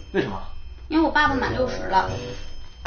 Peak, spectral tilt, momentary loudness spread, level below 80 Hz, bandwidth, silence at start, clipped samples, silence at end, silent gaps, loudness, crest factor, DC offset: -6 dBFS; -3.5 dB/octave; 21 LU; -36 dBFS; 6.6 kHz; 0 s; under 0.1%; 0 s; none; -23 LUFS; 18 dB; under 0.1%